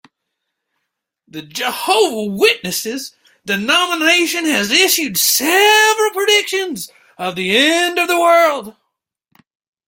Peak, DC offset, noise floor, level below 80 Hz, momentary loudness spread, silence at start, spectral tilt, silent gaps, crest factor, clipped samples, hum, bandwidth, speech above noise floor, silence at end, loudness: 0 dBFS; under 0.1%; -76 dBFS; -62 dBFS; 16 LU; 1.35 s; -1.5 dB/octave; none; 16 dB; under 0.1%; none; 17 kHz; 61 dB; 1.15 s; -13 LUFS